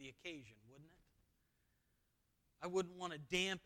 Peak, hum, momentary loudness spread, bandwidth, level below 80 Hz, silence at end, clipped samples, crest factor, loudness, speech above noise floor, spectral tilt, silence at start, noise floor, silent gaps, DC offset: -24 dBFS; none; 20 LU; 17.5 kHz; -74 dBFS; 0.05 s; under 0.1%; 24 dB; -44 LUFS; 37 dB; -3.5 dB/octave; 0 s; -82 dBFS; none; under 0.1%